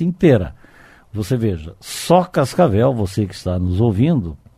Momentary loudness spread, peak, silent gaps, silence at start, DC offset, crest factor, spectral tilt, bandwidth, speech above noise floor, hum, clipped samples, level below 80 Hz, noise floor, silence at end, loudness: 13 LU; 0 dBFS; none; 0 s; under 0.1%; 18 dB; -7 dB/octave; 15 kHz; 29 dB; none; under 0.1%; -40 dBFS; -46 dBFS; 0.2 s; -17 LUFS